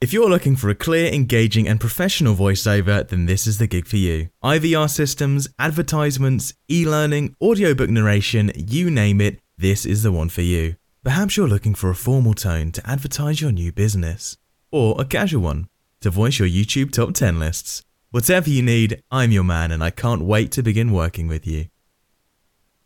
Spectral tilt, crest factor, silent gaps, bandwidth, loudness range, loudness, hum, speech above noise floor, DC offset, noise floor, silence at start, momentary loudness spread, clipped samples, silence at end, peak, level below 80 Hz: -5.5 dB/octave; 16 dB; none; 18 kHz; 3 LU; -19 LUFS; none; 49 dB; under 0.1%; -67 dBFS; 0 s; 8 LU; under 0.1%; 1.2 s; -4 dBFS; -34 dBFS